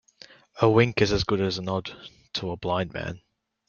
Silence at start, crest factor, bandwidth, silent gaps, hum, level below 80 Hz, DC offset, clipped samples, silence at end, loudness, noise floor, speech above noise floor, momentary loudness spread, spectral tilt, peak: 0.55 s; 22 dB; 7.2 kHz; none; none; -50 dBFS; under 0.1%; under 0.1%; 0.5 s; -25 LUFS; -52 dBFS; 28 dB; 20 LU; -6 dB/octave; -4 dBFS